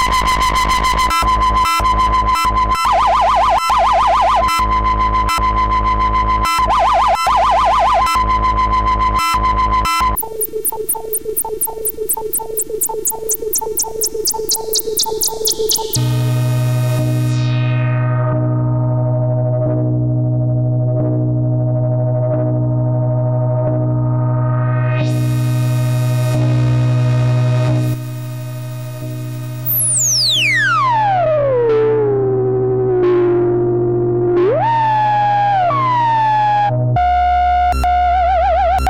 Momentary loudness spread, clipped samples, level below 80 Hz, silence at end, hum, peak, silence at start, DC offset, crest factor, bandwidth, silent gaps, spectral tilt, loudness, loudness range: 5 LU; under 0.1%; -28 dBFS; 0 s; none; -4 dBFS; 0 s; 0.9%; 10 dB; 17 kHz; none; -4.5 dB/octave; -15 LUFS; 4 LU